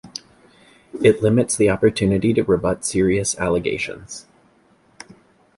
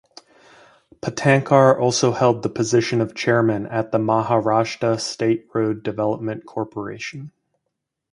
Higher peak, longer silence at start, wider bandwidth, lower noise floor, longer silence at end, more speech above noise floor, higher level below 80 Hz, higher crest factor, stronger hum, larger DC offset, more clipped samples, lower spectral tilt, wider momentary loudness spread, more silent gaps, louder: about the same, -2 dBFS vs 0 dBFS; second, 0.05 s vs 1.05 s; about the same, 11.5 kHz vs 11.5 kHz; second, -57 dBFS vs -79 dBFS; first, 1.35 s vs 0.85 s; second, 38 dB vs 59 dB; first, -44 dBFS vs -58 dBFS; about the same, 18 dB vs 20 dB; neither; neither; neither; about the same, -5 dB/octave vs -5.5 dB/octave; first, 19 LU vs 14 LU; neither; about the same, -19 LUFS vs -20 LUFS